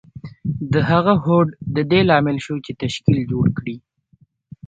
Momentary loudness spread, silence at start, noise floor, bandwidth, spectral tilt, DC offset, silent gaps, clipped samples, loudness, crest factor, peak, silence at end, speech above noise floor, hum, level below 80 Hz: 13 LU; 0.15 s; -57 dBFS; 8.8 kHz; -7.5 dB/octave; under 0.1%; none; under 0.1%; -18 LUFS; 18 dB; 0 dBFS; 0.9 s; 39 dB; none; -46 dBFS